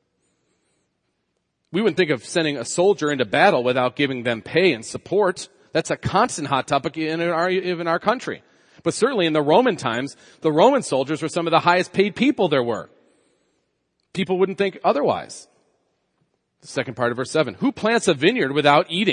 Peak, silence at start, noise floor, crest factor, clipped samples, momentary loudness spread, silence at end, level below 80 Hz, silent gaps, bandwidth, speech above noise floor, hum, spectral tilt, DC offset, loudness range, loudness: 0 dBFS; 1.7 s; -74 dBFS; 20 dB; under 0.1%; 11 LU; 0 s; -62 dBFS; none; 10.5 kHz; 53 dB; none; -4.5 dB/octave; under 0.1%; 5 LU; -20 LUFS